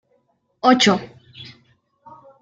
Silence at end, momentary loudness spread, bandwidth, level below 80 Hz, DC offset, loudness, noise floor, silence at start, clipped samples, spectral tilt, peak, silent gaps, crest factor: 1 s; 26 LU; 9.2 kHz; -62 dBFS; under 0.1%; -17 LUFS; -65 dBFS; 0.65 s; under 0.1%; -4 dB/octave; -2 dBFS; none; 20 dB